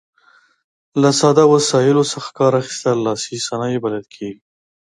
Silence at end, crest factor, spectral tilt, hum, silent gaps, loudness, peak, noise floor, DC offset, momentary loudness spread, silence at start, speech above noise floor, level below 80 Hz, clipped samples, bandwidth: 0.5 s; 16 dB; -5 dB/octave; none; none; -16 LUFS; 0 dBFS; -54 dBFS; under 0.1%; 14 LU; 0.95 s; 38 dB; -62 dBFS; under 0.1%; 11.5 kHz